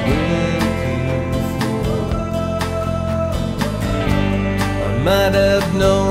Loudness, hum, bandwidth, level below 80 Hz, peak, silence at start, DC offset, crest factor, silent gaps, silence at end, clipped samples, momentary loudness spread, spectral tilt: -18 LUFS; none; 16 kHz; -28 dBFS; -4 dBFS; 0 s; under 0.1%; 14 dB; none; 0 s; under 0.1%; 6 LU; -6 dB/octave